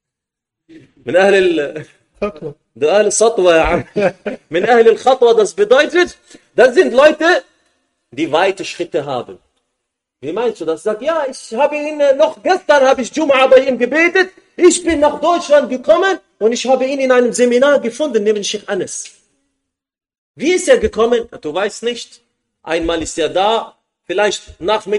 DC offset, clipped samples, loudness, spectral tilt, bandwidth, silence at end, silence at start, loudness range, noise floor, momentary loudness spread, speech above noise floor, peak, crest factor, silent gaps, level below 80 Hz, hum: under 0.1%; under 0.1%; -14 LUFS; -3.5 dB/octave; 11.5 kHz; 0 s; 0.75 s; 7 LU; -82 dBFS; 13 LU; 69 dB; 0 dBFS; 14 dB; 20.18-20.34 s; -44 dBFS; none